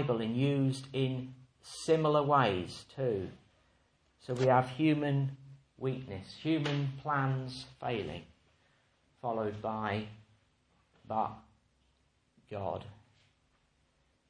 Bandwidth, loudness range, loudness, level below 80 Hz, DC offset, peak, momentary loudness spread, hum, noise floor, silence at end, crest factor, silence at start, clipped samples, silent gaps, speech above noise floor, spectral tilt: 10.5 kHz; 11 LU; -33 LUFS; -68 dBFS; under 0.1%; -12 dBFS; 18 LU; none; -73 dBFS; 1.35 s; 22 dB; 0 s; under 0.1%; none; 41 dB; -7 dB/octave